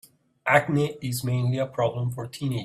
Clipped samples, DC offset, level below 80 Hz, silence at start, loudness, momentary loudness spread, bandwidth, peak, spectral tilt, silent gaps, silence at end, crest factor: under 0.1%; under 0.1%; -60 dBFS; 0.45 s; -25 LUFS; 10 LU; 15 kHz; -4 dBFS; -6 dB/octave; none; 0 s; 22 dB